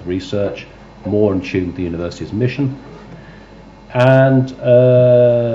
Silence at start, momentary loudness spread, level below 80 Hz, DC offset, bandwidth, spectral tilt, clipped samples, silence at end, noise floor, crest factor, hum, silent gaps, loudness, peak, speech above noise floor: 0 s; 14 LU; -44 dBFS; under 0.1%; 7.6 kHz; -8.5 dB/octave; under 0.1%; 0 s; -39 dBFS; 14 dB; none; none; -15 LUFS; 0 dBFS; 25 dB